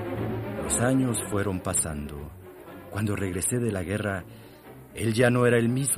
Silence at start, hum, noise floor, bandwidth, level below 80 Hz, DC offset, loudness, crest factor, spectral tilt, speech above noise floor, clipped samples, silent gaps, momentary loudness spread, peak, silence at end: 0 s; none; -47 dBFS; 15.5 kHz; -48 dBFS; under 0.1%; -26 LUFS; 20 dB; -5 dB/octave; 21 dB; under 0.1%; none; 22 LU; -6 dBFS; 0 s